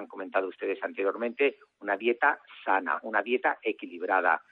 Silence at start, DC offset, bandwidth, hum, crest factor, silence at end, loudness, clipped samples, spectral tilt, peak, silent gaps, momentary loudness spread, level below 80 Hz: 0 s; under 0.1%; 4.3 kHz; none; 18 dB; 0.15 s; -29 LUFS; under 0.1%; -6.5 dB/octave; -10 dBFS; none; 8 LU; -86 dBFS